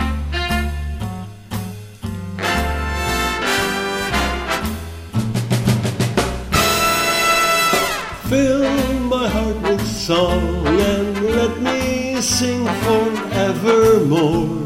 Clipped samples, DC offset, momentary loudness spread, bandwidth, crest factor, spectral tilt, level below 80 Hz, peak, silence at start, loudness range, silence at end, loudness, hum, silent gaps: under 0.1%; 0.2%; 12 LU; 16 kHz; 18 dB; -4.5 dB/octave; -30 dBFS; 0 dBFS; 0 s; 5 LU; 0 s; -18 LUFS; none; none